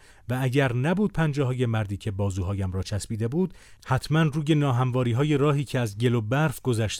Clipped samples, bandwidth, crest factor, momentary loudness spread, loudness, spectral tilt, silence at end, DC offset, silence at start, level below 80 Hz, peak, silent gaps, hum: under 0.1%; 16 kHz; 14 dB; 6 LU; -25 LUFS; -6.5 dB/octave; 0 s; under 0.1%; 0.3 s; -48 dBFS; -10 dBFS; none; none